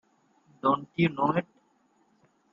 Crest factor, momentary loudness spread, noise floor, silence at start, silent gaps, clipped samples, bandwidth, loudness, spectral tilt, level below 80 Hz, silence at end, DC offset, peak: 20 dB; 6 LU; -68 dBFS; 0.65 s; none; under 0.1%; 7 kHz; -28 LUFS; -8.5 dB/octave; -70 dBFS; 1.1 s; under 0.1%; -12 dBFS